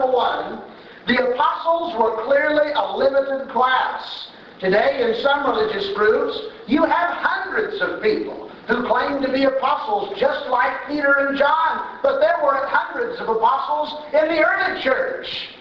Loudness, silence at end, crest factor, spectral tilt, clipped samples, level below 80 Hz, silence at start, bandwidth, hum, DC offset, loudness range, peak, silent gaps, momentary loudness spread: -20 LUFS; 0 s; 18 dB; -6 dB/octave; under 0.1%; -56 dBFS; 0 s; 6.6 kHz; none; under 0.1%; 2 LU; -2 dBFS; none; 8 LU